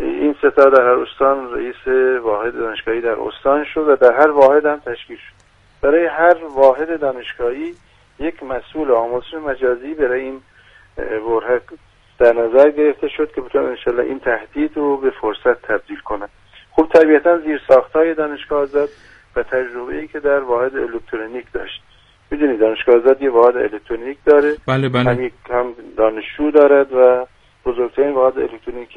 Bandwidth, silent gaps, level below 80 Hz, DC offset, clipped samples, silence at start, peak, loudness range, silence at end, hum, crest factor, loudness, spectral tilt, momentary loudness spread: 6.4 kHz; none; -44 dBFS; under 0.1%; under 0.1%; 0 s; 0 dBFS; 6 LU; 0.1 s; none; 16 dB; -16 LUFS; -7.5 dB/octave; 15 LU